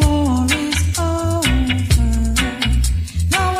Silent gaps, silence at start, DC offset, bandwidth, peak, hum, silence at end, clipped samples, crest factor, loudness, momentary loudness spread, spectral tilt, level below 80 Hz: none; 0 s; under 0.1%; 15.5 kHz; -2 dBFS; none; 0 s; under 0.1%; 14 dB; -17 LUFS; 3 LU; -4.5 dB/octave; -20 dBFS